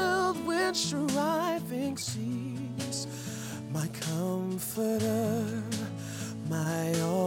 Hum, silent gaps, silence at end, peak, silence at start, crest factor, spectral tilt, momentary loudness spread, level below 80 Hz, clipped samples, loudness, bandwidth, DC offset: none; none; 0 s; -16 dBFS; 0 s; 14 dB; -4.5 dB/octave; 9 LU; -68 dBFS; under 0.1%; -32 LUFS; 17 kHz; under 0.1%